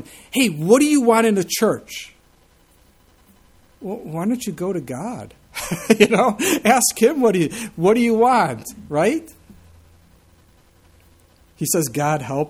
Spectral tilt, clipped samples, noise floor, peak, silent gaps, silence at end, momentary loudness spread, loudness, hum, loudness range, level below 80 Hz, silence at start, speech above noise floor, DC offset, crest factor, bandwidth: -4.5 dB/octave; under 0.1%; -55 dBFS; 0 dBFS; none; 0 s; 16 LU; -18 LUFS; none; 12 LU; -54 dBFS; 0 s; 37 dB; under 0.1%; 20 dB; 16.5 kHz